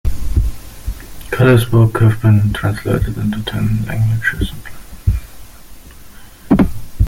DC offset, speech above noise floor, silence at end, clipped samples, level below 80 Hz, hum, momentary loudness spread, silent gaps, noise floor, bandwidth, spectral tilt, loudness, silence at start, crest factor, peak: under 0.1%; 22 dB; 0 s; under 0.1%; -24 dBFS; none; 18 LU; none; -35 dBFS; 16.5 kHz; -7.5 dB/octave; -16 LUFS; 0.05 s; 14 dB; 0 dBFS